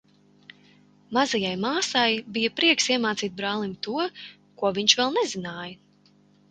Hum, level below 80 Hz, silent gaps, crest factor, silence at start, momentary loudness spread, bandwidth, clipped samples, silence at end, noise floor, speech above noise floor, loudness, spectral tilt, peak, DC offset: 50 Hz at -50 dBFS; -68 dBFS; none; 24 dB; 1.1 s; 14 LU; 9.6 kHz; under 0.1%; 0.75 s; -59 dBFS; 34 dB; -24 LUFS; -2.5 dB/octave; -4 dBFS; under 0.1%